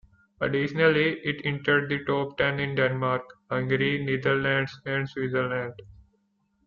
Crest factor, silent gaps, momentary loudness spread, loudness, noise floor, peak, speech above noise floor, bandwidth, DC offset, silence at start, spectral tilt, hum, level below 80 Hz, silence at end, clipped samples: 18 dB; none; 8 LU; -26 LUFS; -71 dBFS; -8 dBFS; 45 dB; 7 kHz; under 0.1%; 0.4 s; -4 dB/octave; none; -60 dBFS; 0.8 s; under 0.1%